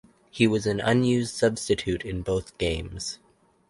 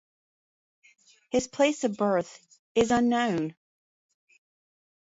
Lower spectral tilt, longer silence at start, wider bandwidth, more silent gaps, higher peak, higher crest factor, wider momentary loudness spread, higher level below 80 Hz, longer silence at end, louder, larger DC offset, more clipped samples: about the same, -5 dB/octave vs -4.5 dB/octave; second, 0.35 s vs 1.35 s; first, 11.5 kHz vs 8 kHz; second, none vs 2.59-2.75 s; first, -6 dBFS vs -10 dBFS; about the same, 20 dB vs 18 dB; first, 12 LU vs 8 LU; first, -44 dBFS vs -60 dBFS; second, 0.55 s vs 1.6 s; about the same, -26 LUFS vs -27 LUFS; neither; neither